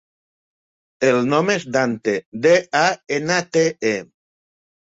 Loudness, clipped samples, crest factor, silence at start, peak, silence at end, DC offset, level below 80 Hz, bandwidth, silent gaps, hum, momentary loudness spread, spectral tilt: -19 LUFS; under 0.1%; 18 dB; 1 s; -2 dBFS; 0.8 s; under 0.1%; -64 dBFS; 8 kHz; 2.26-2.32 s; none; 7 LU; -4.5 dB/octave